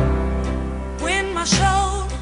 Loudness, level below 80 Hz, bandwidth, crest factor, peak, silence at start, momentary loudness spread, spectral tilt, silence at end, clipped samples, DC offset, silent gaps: -21 LUFS; -26 dBFS; 11 kHz; 16 dB; -4 dBFS; 0 s; 9 LU; -4 dB/octave; 0 s; under 0.1%; under 0.1%; none